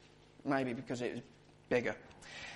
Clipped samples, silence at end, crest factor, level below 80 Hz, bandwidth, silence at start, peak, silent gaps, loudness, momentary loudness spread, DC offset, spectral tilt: under 0.1%; 0 s; 22 dB; -70 dBFS; 11.5 kHz; 0 s; -18 dBFS; none; -39 LUFS; 13 LU; under 0.1%; -5.5 dB/octave